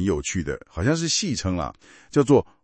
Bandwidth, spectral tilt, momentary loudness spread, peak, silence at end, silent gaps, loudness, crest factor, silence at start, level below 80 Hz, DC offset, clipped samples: 8.8 kHz; -4.5 dB/octave; 10 LU; -4 dBFS; 0.2 s; none; -23 LUFS; 18 dB; 0 s; -44 dBFS; under 0.1%; under 0.1%